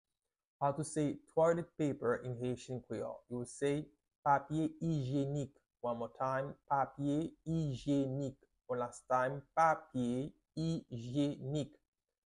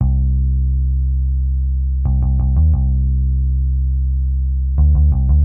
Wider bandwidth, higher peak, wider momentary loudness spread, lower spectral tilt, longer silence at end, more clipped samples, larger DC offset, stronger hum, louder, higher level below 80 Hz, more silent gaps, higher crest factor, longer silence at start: first, 11.5 kHz vs 1.2 kHz; second, -18 dBFS vs -4 dBFS; first, 10 LU vs 5 LU; second, -7 dB/octave vs -15 dB/octave; first, 0.6 s vs 0 s; neither; neither; neither; second, -37 LUFS vs -17 LUFS; second, -68 dBFS vs -14 dBFS; first, 4.18-4.23 s vs none; first, 20 dB vs 10 dB; first, 0.6 s vs 0 s